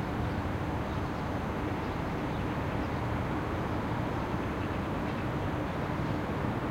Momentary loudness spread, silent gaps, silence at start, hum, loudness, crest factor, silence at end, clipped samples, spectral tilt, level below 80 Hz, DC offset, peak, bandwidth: 1 LU; none; 0 s; none; -33 LUFS; 14 dB; 0 s; under 0.1%; -7.5 dB/octave; -44 dBFS; under 0.1%; -18 dBFS; 16.5 kHz